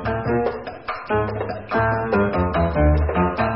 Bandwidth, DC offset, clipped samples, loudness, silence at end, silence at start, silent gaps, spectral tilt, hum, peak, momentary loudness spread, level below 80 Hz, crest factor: 5.8 kHz; 0.3%; under 0.1%; -21 LUFS; 0 s; 0 s; none; -12 dB/octave; none; -6 dBFS; 9 LU; -28 dBFS; 14 dB